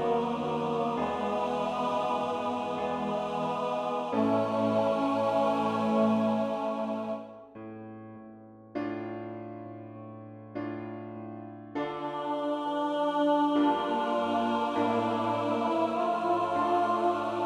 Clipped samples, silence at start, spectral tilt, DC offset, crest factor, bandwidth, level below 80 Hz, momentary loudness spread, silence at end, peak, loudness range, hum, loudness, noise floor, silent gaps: under 0.1%; 0 s; -6.5 dB/octave; under 0.1%; 16 dB; 11.5 kHz; -70 dBFS; 17 LU; 0 s; -14 dBFS; 12 LU; none; -29 LUFS; -50 dBFS; none